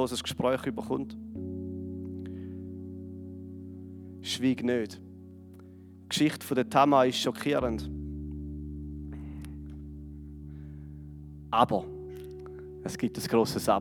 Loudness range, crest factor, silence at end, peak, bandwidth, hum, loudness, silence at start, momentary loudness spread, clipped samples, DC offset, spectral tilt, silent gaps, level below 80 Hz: 12 LU; 24 dB; 0 s; -6 dBFS; 19 kHz; none; -30 LUFS; 0 s; 19 LU; under 0.1%; under 0.1%; -5 dB/octave; none; -50 dBFS